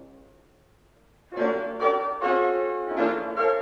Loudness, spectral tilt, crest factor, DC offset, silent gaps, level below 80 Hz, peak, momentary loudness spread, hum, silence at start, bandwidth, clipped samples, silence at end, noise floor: -25 LUFS; -6 dB/octave; 18 dB; under 0.1%; none; -62 dBFS; -8 dBFS; 4 LU; none; 0 s; 7 kHz; under 0.1%; 0 s; -59 dBFS